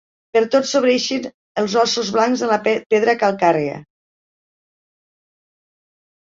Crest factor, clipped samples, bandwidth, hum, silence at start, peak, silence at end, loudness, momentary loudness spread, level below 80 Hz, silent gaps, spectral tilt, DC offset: 18 dB; under 0.1%; 7.8 kHz; none; 0.35 s; -2 dBFS; 2.5 s; -18 LUFS; 8 LU; -66 dBFS; 1.34-1.55 s, 2.86-2.90 s; -3.5 dB/octave; under 0.1%